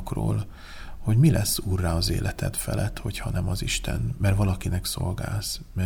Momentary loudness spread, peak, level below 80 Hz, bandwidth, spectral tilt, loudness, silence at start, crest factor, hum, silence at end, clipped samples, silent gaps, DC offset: 10 LU; -8 dBFS; -36 dBFS; 19 kHz; -5 dB/octave; -26 LUFS; 0 s; 18 dB; none; 0 s; under 0.1%; none; under 0.1%